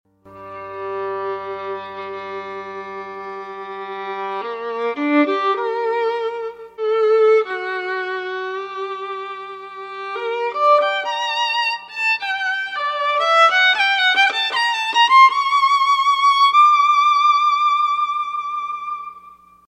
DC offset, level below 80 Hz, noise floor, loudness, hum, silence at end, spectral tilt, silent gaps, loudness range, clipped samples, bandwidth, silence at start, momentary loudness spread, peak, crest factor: under 0.1%; -70 dBFS; -45 dBFS; -17 LUFS; none; 0.35 s; -1.5 dB/octave; none; 15 LU; under 0.1%; 10.5 kHz; 0.25 s; 18 LU; -2 dBFS; 18 dB